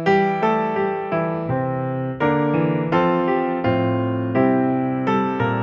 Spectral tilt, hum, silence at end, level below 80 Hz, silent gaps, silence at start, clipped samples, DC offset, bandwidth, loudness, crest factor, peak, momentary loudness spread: -9 dB/octave; none; 0 s; -54 dBFS; none; 0 s; under 0.1%; under 0.1%; 7 kHz; -20 LUFS; 14 dB; -6 dBFS; 5 LU